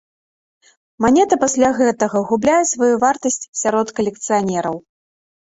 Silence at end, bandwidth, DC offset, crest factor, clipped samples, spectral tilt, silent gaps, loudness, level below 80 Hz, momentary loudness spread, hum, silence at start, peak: 0.8 s; 8 kHz; under 0.1%; 18 dB; under 0.1%; -4 dB/octave; 3.48-3.53 s; -17 LUFS; -54 dBFS; 7 LU; none; 1 s; 0 dBFS